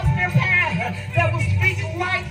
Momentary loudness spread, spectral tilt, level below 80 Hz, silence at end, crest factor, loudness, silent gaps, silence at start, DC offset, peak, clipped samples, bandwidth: 7 LU; -6 dB/octave; -36 dBFS; 0 s; 14 dB; -20 LUFS; none; 0 s; under 0.1%; -6 dBFS; under 0.1%; 15 kHz